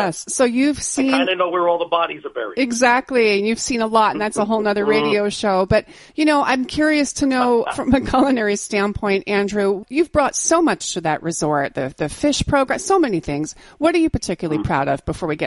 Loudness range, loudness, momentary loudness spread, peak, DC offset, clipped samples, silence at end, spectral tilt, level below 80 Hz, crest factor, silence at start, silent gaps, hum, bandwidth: 2 LU; -18 LUFS; 6 LU; -2 dBFS; under 0.1%; under 0.1%; 0 s; -4 dB/octave; -42 dBFS; 16 dB; 0 s; none; none; 11.5 kHz